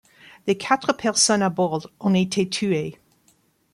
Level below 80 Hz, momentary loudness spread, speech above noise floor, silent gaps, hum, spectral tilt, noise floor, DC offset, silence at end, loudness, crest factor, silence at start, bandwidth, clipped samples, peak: -64 dBFS; 8 LU; 41 dB; none; none; -4 dB/octave; -62 dBFS; under 0.1%; 0.8 s; -22 LUFS; 20 dB; 0.45 s; 12.5 kHz; under 0.1%; -4 dBFS